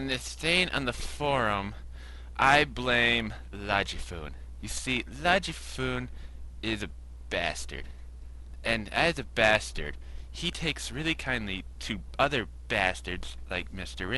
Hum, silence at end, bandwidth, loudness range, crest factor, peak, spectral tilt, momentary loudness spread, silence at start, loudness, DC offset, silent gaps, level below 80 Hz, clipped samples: none; 0 s; 11.5 kHz; 5 LU; 22 dB; -10 dBFS; -3.5 dB/octave; 19 LU; 0 s; -29 LUFS; under 0.1%; none; -42 dBFS; under 0.1%